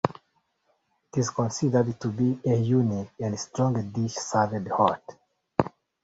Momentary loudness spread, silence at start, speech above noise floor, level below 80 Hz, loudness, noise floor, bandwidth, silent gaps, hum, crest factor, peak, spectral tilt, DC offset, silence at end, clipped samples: 7 LU; 0.05 s; 46 dB; -58 dBFS; -27 LUFS; -72 dBFS; 8 kHz; none; none; 24 dB; -2 dBFS; -6.5 dB/octave; under 0.1%; 0.35 s; under 0.1%